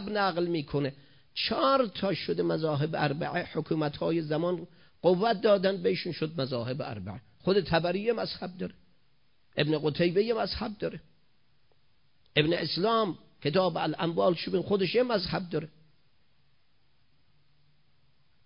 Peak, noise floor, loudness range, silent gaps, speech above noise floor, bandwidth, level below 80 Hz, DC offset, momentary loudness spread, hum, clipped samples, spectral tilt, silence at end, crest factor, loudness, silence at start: -10 dBFS; -72 dBFS; 4 LU; none; 43 dB; 5.4 kHz; -58 dBFS; under 0.1%; 11 LU; none; under 0.1%; -10 dB/octave; 2.8 s; 20 dB; -29 LUFS; 0 s